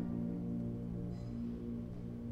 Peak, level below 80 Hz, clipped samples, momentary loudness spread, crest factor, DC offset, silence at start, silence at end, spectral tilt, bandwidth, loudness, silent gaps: -30 dBFS; -54 dBFS; under 0.1%; 5 LU; 12 dB; under 0.1%; 0 s; 0 s; -10 dB/octave; 7.2 kHz; -42 LUFS; none